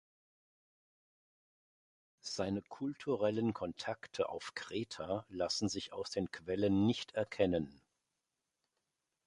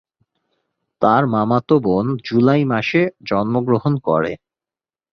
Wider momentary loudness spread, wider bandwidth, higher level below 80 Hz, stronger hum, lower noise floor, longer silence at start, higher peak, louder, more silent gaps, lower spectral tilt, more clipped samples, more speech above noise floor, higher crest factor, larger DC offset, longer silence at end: first, 9 LU vs 5 LU; first, 11.5 kHz vs 6.6 kHz; second, -66 dBFS vs -54 dBFS; neither; about the same, -88 dBFS vs under -90 dBFS; first, 2.25 s vs 1 s; second, -16 dBFS vs -2 dBFS; second, -38 LUFS vs -17 LUFS; neither; second, -5 dB/octave vs -8.5 dB/octave; neither; second, 51 dB vs over 73 dB; first, 22 dB vs 16 dB; neither; first, 1.55 s vs 0.75 s